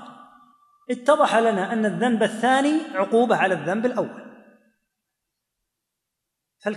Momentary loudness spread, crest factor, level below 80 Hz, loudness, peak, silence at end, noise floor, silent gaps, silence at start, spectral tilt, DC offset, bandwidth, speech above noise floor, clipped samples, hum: 11 LU; 20 dB; -82 dBFS; -21 LUFS; -4 dBFS; 0 s; -82 dBFS; none; 0 s; -5 dB/octave; under 0.1%; 12 kHz; 62 dB; under 0.1%; none